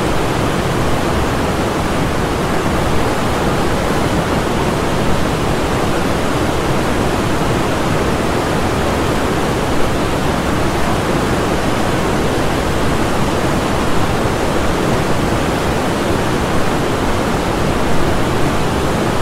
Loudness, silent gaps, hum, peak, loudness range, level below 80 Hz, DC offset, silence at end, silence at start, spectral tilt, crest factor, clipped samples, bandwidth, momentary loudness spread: -16 LUFS; none; none; -2 dBFS; 0 LU; -26 dBFS; under 0.1%; 0 s; 0 s; -5.5 dB/octave; 14 dB; under 0.1%; 16 kHz; 1 LU